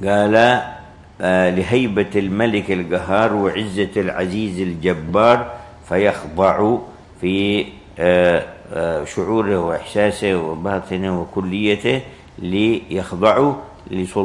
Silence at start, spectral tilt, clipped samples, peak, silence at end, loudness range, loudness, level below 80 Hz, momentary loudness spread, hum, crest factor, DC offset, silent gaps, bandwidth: 0 s; -6 dB/octave; under 0.1%; 0 dBFS; 0 s; 2 LU; -18 LUFS; -48 dBFS; 10 LU; none; 18 dB; under 0.1%; none; 11.5 kHz